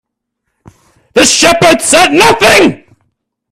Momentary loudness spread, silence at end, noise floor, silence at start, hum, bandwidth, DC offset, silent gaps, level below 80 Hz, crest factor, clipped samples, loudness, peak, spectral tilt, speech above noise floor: 5 LU; 0.75 s; -70 dBFS; 1.15 s; none; over 20 kHz; under 0.1%; none; -40 dBFS; 10 dB; 0.6%; -6 LUFS; 0 dBFS; -2.5 dB/octave; 64 dB